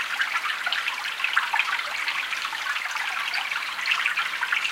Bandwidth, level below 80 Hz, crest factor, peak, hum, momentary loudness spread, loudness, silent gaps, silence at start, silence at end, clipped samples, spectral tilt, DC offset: 17 kHz; -70 dBFS; 22 dB; -6 dBFS; none; 4 LU; -25 LUFS; none; 0 s; 0 s; under 0.1%; 2 dB/octave; under 0.1%